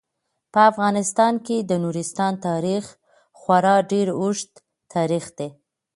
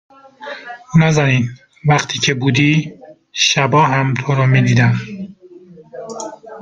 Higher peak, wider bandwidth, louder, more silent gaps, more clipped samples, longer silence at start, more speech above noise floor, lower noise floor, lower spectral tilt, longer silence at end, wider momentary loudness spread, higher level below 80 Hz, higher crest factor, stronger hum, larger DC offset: about the same, -2 dBFS vs 0 dBFS; first, 11.5 kHz vs 7.6 kHz; second, -21 LUFS vs -14 LUFS; neither; neither; first, 0.55 s vs 0.4 s; first, 57 dB vs 27 dB; first, -77 dBFS vs -40 dBFS; about the same, -5 dB/octave vs -5 dB/octave; first, 0.45 s vs 0 s; second, 16 LU vs 19 LU; second, -68 dBFS vs -50 dBFS; about the same, 20 dB vs 16 dB; neither; neither